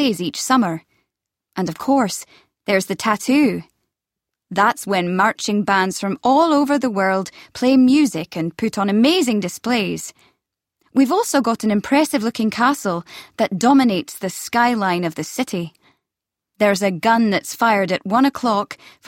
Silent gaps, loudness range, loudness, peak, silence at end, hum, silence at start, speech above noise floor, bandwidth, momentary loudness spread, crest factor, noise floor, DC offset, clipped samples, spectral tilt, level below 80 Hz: none; 4 LU; -18 LUFS; -2 dBFS; 0.3 s; none; 0 s; 66 dB; 16.5 kHz; 11 LU; 16 dB; -84 dBFS; under 0.1%; under 0.1%; -4.5 dB/octave; -62 dBFS